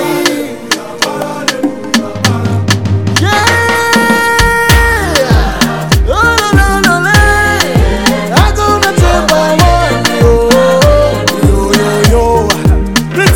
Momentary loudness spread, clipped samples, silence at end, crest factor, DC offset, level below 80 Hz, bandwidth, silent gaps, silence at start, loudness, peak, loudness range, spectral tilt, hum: 6 LU; 2%; 0 s; 8 dB; under 0.1%; -16 dBFS; over 20 kHz; none; 0 s; -9 LUFS; 0 dBFS; 2 LU; -4.5 dB/octave; none